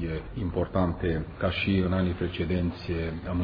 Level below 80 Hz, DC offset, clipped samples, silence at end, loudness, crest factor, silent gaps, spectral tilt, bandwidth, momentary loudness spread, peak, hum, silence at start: -42 dBFS; under 0.1%; under 0.1%; 0 s; -29 LUFS; 18 dB; none; -9.5 dB/octave; 5.2 kHz; 7 LU; -10 dBFS; none; 0 s